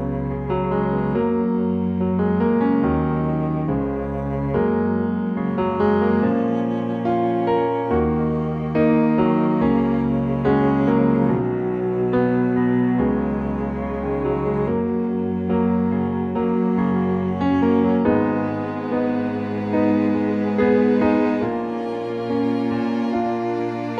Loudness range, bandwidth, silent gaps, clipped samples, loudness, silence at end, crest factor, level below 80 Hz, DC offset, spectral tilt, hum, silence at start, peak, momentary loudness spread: 2 LU; 5.6 kHz; none; under 0.1%; -21 LUFS; 0 s; 14 dB; -40 dBFS; under 0.1%; -10 dB/octave; none; 0 s; -6 dBFS; 6 LU